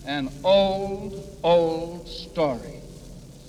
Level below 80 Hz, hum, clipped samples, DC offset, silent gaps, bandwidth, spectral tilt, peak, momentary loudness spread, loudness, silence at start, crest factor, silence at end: -46 dBFS; none; under 0.1%; under 0.1%; none; 14 kHz; -6 dB/octave; -10 dBFS; 22 LU; -24 LUFS; 0 s; 16 dB; 0 s